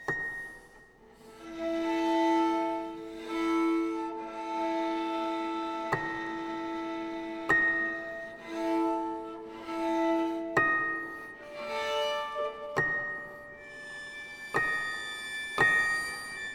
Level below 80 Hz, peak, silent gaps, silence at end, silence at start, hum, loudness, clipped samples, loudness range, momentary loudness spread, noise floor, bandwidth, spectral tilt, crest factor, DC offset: -62 dBFS; -12 dBFS; none; 0 s; 0 s; none; -31 LUFS; under 0.1%; 3 LU; 15 LU; -56 dBFS; 15 kHz; -4 dB/octave; 20 dB; under 0.1%